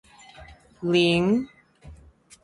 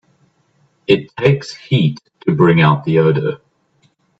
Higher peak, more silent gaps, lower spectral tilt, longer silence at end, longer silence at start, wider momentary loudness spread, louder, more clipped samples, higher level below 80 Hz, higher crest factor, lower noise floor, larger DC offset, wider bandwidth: second, -8 dBFS vs 0 dBFS; neither; second, -6 dB/octave vs -7.5 dB/octave; second, 0.5 s vs 0.85 s; second, 0.4 s vs 0.9 s; about the same, 14 LU vs 12 LU; second, -22 LUFS vs -15 LUFS; neither; about the same, -54 dBFS vs -54 dBFS; about the same, 18 dB vs 16 dB; second, -52 dBFS vs -59 dBFS; neither; first, 11.5 kHz vs 7.8 kHz